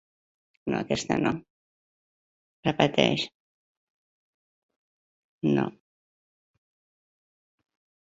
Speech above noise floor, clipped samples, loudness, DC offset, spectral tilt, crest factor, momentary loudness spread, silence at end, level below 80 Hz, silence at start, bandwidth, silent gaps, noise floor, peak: over 65 dB; under 0.1%; -27 LUFS; under 0.1%; -5.5 dB/octave; 28 dB; 12 LU; 2.4 s; -62 dBFS; 0.65 s; 8 kHz; 1.50-2.63 s, 3.34-4.69 s, 4.76-5.41 s; under -90 dBFS; -4 dBFS